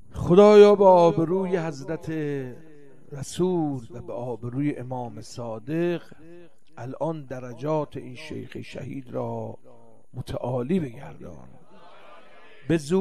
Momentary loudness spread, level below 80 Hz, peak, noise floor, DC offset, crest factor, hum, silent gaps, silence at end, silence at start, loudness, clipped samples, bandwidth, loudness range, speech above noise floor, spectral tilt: 23 LU; -54 dBFS; -2 dBFS; -51 dBFS; 0.7%; 22 dB; none; none; 0 s; 0.15 s; -22 LUFS; under 0.1%; 11.5 kHz; 13 LU; 28 dB; -7 dB/octave